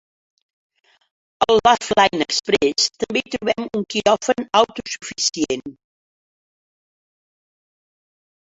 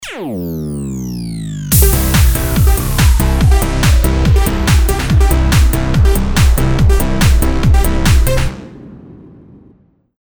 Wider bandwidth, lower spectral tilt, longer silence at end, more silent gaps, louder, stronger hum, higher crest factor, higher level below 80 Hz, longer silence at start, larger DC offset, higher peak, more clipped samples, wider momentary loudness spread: second, 8 kHz vs over 20 kHz; second, -2.5 dB/octave vs -5 dB/octave; first, 2.75 s vs 1.05 s; neither; second, -19 LUFS vs -13 LUFS; neither; first, 20 dB vs 12 dB; second, -56 dBFS vs -14 dBFS; first, 1.4 s vs 0 s; neither; about the same, -2 dBFS vs 0 dBFS; neither; about the same, 9 LU vs 11 LU